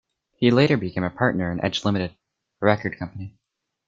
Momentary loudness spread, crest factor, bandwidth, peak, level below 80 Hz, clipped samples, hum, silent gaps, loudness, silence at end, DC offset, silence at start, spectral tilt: 15 LU; 22 dB; 7.6 kHz; -2 dBFS; -56 dBFS; under 0.1%; none; none; -22 LUFS; 0.6 s; under 0.1%; 0.4 s; -6.5 dB/octave